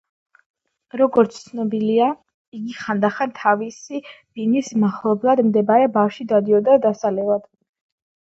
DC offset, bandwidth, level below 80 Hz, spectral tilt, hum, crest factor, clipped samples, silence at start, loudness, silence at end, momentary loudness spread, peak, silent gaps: under 0.1%; 7.8 kHz; -68 dBFS; -6.5 dB/octave; none; 18 dB; under 0.1%; 0.95 s; -19 LUFS; 0.9 s; 16 LU; 0 dBFS; 2.34-2.52 s